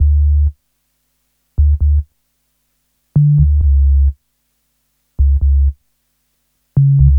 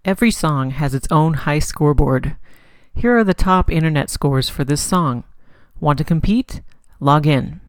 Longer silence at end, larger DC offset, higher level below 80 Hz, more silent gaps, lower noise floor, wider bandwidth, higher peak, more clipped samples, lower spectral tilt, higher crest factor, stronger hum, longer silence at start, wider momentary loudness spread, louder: about the same, 0 s vs 0.1 s; neither; first, -16 dBFS vs -28 dBFS; neither; first, -65 dBFS vs -41 dBFS; second, 0.8 kHz vs 18 kHz; about the same, 0 dBFS vs 0 dBFS; neither; first, -13 dB/octave vs -6 dB/octave; about the same, 14 dB vs 16 dB; neither; about the same, 0 s vs 0.05 s; about the same, 8 LU vs 7 LU; first, -14 LUFS vs -17 LUFS